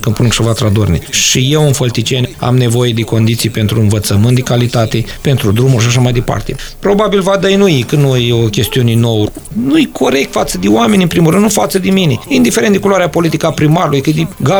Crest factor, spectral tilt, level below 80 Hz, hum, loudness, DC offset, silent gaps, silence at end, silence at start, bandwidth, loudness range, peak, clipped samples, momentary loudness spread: 10 dB; -5.5 dB/octave; -32 dBFS; none; -11 LUFS; under 0.1%; none; 0 s; 0 s; over 20 kHz; 1 LU; 0 dBFS; under 0.1%; 5 LU